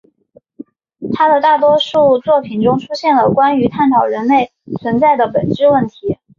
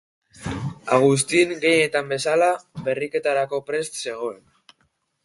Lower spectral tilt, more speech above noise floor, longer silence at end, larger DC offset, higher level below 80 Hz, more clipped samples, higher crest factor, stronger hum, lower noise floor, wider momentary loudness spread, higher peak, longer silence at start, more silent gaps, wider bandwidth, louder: first, -7 dB/octave vs -4 dB/octave; second, 38 dB vs 47 dB; second, 0.25 s vs 0.9 s; neither; about the same, -50 dBFS vs -54 dBFS; neither; second, 12 dB vs 20 dB; neither; second, -50 dBFS vs -68 dBFS; second, 9 LU vs 13 LU; about the same, -2 dBFS vs -2 dBFS; first, 0.6 s vs 0.4 s; neither; second, 7.2 kHz vs 12 kHz; first, -13 LUFS vs -22 LUFS